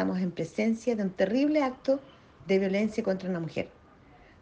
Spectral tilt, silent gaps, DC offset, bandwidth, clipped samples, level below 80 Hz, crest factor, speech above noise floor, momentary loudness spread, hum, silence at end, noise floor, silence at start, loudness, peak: -7 dB/octave; none; under 0.1%; 8.8 kHz; under 0.1%; -62 dBFS; 16 dB; 27 dB; 8 LU; none; 0.7 s; -55 dBFS; 0 s; -29 LUFS; -12 dBFS